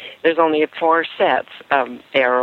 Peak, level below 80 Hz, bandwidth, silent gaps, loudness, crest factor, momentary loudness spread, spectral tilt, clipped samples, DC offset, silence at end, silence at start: -2 dBFS; -68 dBFS; 5 kHz; none; -18 LUFS; 16 dB; 4 LU; -6 dB/octave; under 0.1%; under 0.1%; 0 s; 0 s